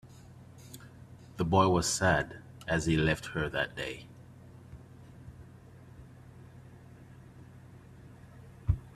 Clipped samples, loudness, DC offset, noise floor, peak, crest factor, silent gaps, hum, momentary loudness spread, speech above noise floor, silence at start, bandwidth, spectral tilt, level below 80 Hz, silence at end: under 0.1%; -30 LUFS; under 0.1%; -52 dBFS; -10 dBFS; 24 dB; none; none; 26 LU; 23 dB; 0.05 s; 14.5 kHz; -4.5 dB/octave; -50 dBFS; 0.05 s